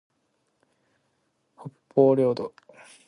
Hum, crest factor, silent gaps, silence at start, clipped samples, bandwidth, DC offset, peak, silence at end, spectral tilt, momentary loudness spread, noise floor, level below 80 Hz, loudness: none; 22 dB; none; 1.65 s; under 0.1%; 11 kHz; under 0.1%; -6 dBFS; 0.6 s; -8.5 dB/octave; 25 LU; -73 dBFS; -72 dBFS; -23 LUFS